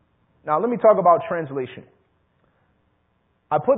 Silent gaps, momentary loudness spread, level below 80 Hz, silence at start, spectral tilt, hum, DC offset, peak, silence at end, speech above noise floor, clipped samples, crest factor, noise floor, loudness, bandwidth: none; 16 LU; -66 dBFS; 0.45 s; -11.5 dB/octave; none; under 0.1%; -4 dBFS; 0 s; 47 dB; under 0.1%; 18 dB; -67 dBFS; -20 LUFS; 3.9 kHz